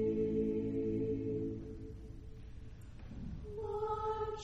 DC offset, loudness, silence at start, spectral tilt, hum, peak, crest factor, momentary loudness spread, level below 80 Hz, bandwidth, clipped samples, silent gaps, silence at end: under 0.1%; -39 LUFS; 0 s; -9 dB/octave; none; -24 dBFS; 14 dB; 18 LU; -52 dBFS; 7.8 kHz; under 0.1%; none; 0 s